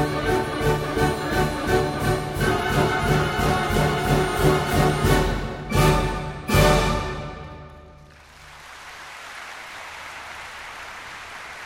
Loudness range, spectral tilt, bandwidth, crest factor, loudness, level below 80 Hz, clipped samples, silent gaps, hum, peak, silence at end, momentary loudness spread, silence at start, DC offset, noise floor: 16 LU; -5.5 dB/octave; 16.5 kHz; 18 dB; -22 LUFS; -32 dBFS; under 0.1%; none; none; -4 dBFS; 0 s; 17 LU; 0 s; under 0.1%; -47 dBFS